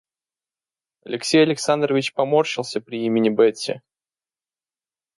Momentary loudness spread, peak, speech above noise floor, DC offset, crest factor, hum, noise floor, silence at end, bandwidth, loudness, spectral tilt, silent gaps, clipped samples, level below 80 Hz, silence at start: 12 LU; -4 dBFS; over 70 dB; under 0.1%; 18 dB; none; under -90 dBFS; 1.4 s; 11.5 kHz; -20 LUFS; -4.5 dB/octave; none; under 0.1%; -70 dBFS; 1.05 s